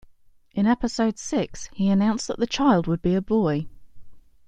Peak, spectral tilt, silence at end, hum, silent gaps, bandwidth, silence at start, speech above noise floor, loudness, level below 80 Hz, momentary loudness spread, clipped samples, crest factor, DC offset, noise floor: -6 dBFS; -6 dB/octave; 0.3 s; none; none; 9.2 kHz; 0.55 s; 31 dB; -23 LUFS; -46 dBFS; 8 LU; under 0.1%; 18 dB; under 0.1%; -53 dBFS